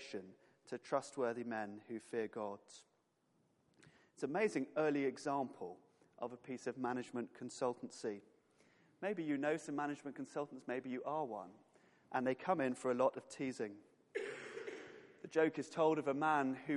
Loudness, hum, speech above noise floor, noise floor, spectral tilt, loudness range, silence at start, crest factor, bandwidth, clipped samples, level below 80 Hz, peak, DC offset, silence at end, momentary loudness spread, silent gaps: -41 LUFS; none; 39 dB; -79 dBFS; -5.5 dB/octave; 4 LU; 0 s; 20 dB; 11.5 kHz; under 0.1%; under -90 dBFS; -22 dBFS; under 0.1%; 0 s; 15 LU; none